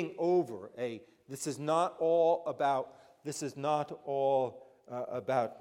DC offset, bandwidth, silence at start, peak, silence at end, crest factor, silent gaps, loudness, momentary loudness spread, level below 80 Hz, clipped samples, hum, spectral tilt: under 0.1%; 16 kHz; 0 s; -16 dBFS; 0 s; 16 dB; none; -33 LUFS; 13 LU; -82 dBFS; under 0.1%; none; -5.5 dB/octave